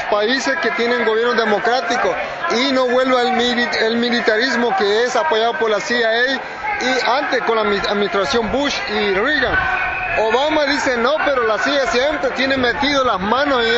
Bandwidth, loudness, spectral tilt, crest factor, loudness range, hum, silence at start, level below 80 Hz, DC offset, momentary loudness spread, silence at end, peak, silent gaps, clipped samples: 8.2 kHz; -16 LUFS; -3.5 dB/octave; 14 dB; 1 LU; none; 0 s; -44 dBFS; under 0.1%; 3 LU; 0 s; -2 dBFS; none; under 0.1%